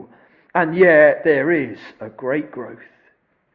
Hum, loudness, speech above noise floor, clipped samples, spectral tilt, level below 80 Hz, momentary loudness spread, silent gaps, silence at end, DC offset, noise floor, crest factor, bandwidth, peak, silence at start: none; -16 LUFS; 44 dB; under 0.1%; -9.5 dB/octave; -60 dBFS; 23 LU; none; 0.8 s; under 0.1%; -61 dBFS; 18 dB; 5 kHz; -2 dBFS; 0 s